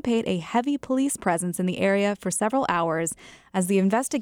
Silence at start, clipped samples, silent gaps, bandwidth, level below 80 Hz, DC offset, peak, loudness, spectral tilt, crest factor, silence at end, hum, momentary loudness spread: 0.05 s; under 0.1%; none; 17 kHz; -60 dBFS; under 0.1%; -8 dBFS; -24 LUFS; -5 dB/octave; 16 dB; 0 s; none; 6 LU